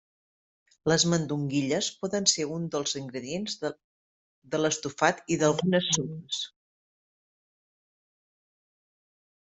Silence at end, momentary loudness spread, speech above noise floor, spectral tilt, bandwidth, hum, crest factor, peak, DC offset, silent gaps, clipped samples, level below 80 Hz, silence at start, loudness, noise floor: 3 s; 10 LU; over 62 dB; -3.5 dB/octave; 8.2 kHz; none; 24 dB; -8 dBFS; under 0.1%; 3.84-4.42 s; under 0.1%; -66 dBFS; 0.85 s; -28 LUFS; under -90 dBFS